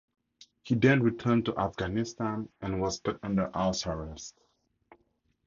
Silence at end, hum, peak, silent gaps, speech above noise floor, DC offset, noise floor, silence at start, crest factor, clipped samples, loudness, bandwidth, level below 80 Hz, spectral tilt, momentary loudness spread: 1.15 s; none; -8 dBFS; none; 44 dB; under 0.1%; -73 dBFS; 0.65 s; 22 dB; under 0.1%; -30 LUFS; 7.6 kHz; -52 dBFS; -6 dB/octave; 13 LU